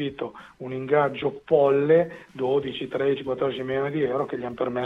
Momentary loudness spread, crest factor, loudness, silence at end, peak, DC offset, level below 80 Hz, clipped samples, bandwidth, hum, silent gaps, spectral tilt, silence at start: 13 LU; 18 dB; -24 LUFS; 0 s; -6 dBFS; under 0.1%; -62 dBFS; under 0.1%; 5.8 kHz; none; none; -8 dB/octave; 0 s